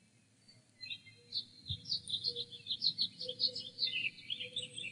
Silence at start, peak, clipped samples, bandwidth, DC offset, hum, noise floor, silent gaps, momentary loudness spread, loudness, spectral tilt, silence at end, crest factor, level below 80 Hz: 0.5 s; -18 dBFS; under 0.1%; 11 kHz; under 0.1%; none; -67 dBFS; none; 12 LU; -37 LUFS; -1.5 dB/octave; 0 s; 24 dB; -72 dBFS